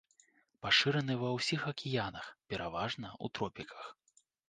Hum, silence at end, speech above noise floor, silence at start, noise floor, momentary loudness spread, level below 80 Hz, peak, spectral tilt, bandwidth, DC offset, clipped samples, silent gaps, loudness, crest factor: none; 0.55 s; 34 dB; 0.65 s; -70 dBFS; 19 LU; -66 dBFS; -14 dBFS; -4.5 dB/octave; 9.6 kHz; under 0.1%; under 0.1%; none; -35 LUFS; 24 dB